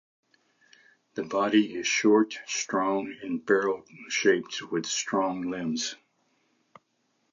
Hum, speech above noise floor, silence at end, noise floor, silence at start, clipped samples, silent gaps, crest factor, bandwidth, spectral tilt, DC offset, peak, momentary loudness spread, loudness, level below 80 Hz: none; 47 dB; 1.4 s; -73 dBFS; 1.15 s; under 0.1%; none; 20 dB; 7.6 kHz; -3 dB/octave; under 0.1%; -10 dBFS; 11 LU; -27 LUFS; -74 dBFS